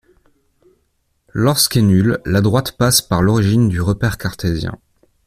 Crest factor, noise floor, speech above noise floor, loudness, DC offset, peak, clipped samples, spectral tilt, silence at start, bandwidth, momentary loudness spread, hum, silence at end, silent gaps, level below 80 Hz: 16 dB; -65 dBFS; 50 dB; -15 LUFS; under 0.1%; 0 dBFS; under 0.1%; -5 dB/octave; 1.35 s; 15.5 kHz; 8 LU; none; 0.5 s; none; -38 dBFS